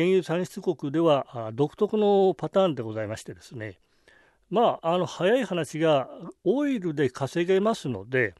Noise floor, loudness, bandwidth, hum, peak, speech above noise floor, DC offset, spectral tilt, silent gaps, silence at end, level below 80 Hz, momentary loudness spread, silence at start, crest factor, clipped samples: -60 dBFS; -25 LUFS; 12.5 kHz; none; -10 dBFS; 35 dB; under 0.1%; -6.5 dB/octave; none; 0.1 s; -68 dBFS; 12 LU; 0 s; 16 dB; under 0.1%